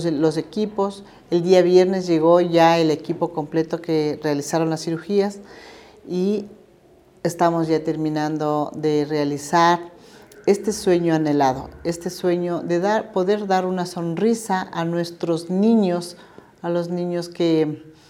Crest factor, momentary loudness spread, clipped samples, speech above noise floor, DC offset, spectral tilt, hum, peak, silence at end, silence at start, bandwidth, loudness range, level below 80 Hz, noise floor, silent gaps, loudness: 18 dB; 10 LU; under 0.1%; 32 dB; under 0.1%; -6 dB/octave; none; -2 dBFS; 0.2 s; 0 s; 15 kHz; 6 LU; -58 dBFS; -52 dBFS; none; -21 LUFS